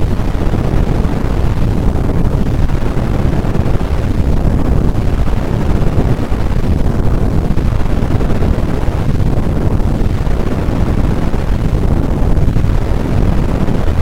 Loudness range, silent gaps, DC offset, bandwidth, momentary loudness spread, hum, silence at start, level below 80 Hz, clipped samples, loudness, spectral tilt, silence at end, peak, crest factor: 0 LU; none; 10%; 12.5 kHz; 2 LU; none; 0 s; -14 dBFS; 0.1%; -15 LUFS; -8 dB/octave; 0 s; 0 dBFS; 10 dB